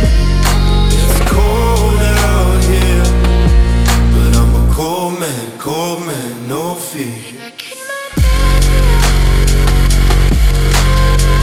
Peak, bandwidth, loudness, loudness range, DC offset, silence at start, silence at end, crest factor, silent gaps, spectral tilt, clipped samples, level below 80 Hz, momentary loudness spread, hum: 0 dBFS; 16 kHz; -13 LUFS; 7 LU; under 0.1%; 0 s; 0 s; 10 dB; none; -5 dB/octave; under 0.1%; -12 dBFS; 10 LU; none